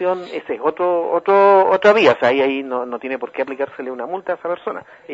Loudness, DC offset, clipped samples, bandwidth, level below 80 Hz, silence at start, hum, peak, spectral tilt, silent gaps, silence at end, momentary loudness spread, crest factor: -17 LUFS; under 0.1%; under 0.1%; 7.8 kHz; -68 dBFS; 0 s; none; 0 dBFS; -5.5 dB/octave; none; 0 s; 14 LU; 18 dB